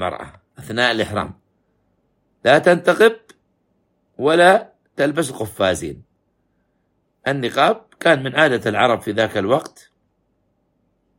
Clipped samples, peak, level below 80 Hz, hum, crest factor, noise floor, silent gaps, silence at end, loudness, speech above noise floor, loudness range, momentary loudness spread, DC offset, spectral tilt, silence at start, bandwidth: under 0.1%; 0 dBFS; -56 dBFS; none; 20 dB; -67 dBFS; none; 1.5 s; -17 LUFS; 50 dB; 4 LU; 14 LU; under 0.1%; -4.5 dB/octave; 0 s; 16.5 kHz